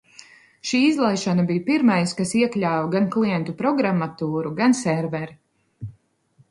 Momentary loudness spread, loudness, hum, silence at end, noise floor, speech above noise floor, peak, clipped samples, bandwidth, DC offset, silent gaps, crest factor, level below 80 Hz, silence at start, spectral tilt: 13 LU; -21 LUFS; none; 0.6 s; -60 dBFS; 39 dB; -6 dBFS; under 0.1%; 11.5 kHz; under 0.1%; none; 16 dB; -62 dBFS; 0.65 s; -5.5 dB/octave